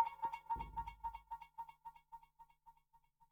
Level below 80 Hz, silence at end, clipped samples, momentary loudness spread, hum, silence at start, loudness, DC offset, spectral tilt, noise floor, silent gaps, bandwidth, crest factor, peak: -62 dBFS; 0.35 s; under 0.1%; 22 LU; 50 Hz at -75 dBFS; 0 s; -47 LUFS; under 0.1%; -5.5 dB/octave; -74 dBFS; none; 18.5 kHz; 24 dB; -22 dBFS